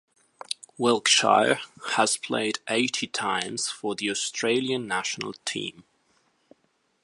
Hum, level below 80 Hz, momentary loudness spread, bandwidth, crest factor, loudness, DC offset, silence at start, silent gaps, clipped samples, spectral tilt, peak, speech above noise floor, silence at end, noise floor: none; -74 dBFS; 12 LU; 11.5 kHz; 22 dB; -25 LUFS; under 0.1%; 0.5 s; none; under 0.1%; -2 dB/octave; -4 dBFS; 45 dB; 1.25 s; -70 dBFS